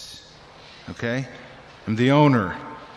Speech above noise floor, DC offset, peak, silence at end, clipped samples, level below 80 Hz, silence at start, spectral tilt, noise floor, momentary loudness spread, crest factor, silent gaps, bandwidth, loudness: 26 dB; under 0.1%; -6 dBFS; 0 s; under 0.1%; -58 dBFS; 0 s; -7 dB/octave; -46 dBFS; 25 LU; 18 dB; none; 11.5 kHz; -21 LUFS